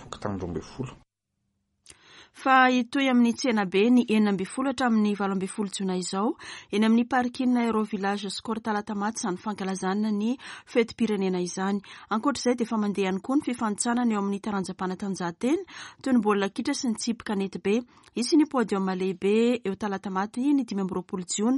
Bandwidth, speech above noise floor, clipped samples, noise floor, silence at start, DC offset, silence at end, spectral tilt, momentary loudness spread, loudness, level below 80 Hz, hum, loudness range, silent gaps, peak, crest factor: 11.5 kHz; 53 dB; under 0.1%; -78 dBFS; 0 s; under 0.1%; 0 s; -5 dB/octave; 9 LU; -26 LUFS; -64 dBFS; none; 5 LU; none; -8 dBFS; 18 dB